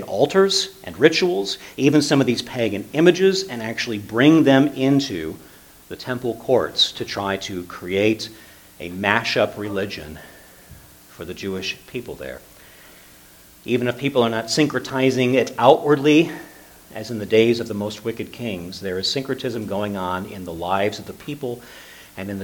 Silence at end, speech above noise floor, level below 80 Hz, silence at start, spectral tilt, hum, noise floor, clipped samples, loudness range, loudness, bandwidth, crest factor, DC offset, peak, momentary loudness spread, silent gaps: 0 s; 27 dB; -56 dBFS; 0 s; -5 dB/octave; none; -48 dBFS; under 0.1%; 9 LU; -20 LUFS; 19 kHz; 22 dB; under 0.1%; 0 dBFS; 18 LU; none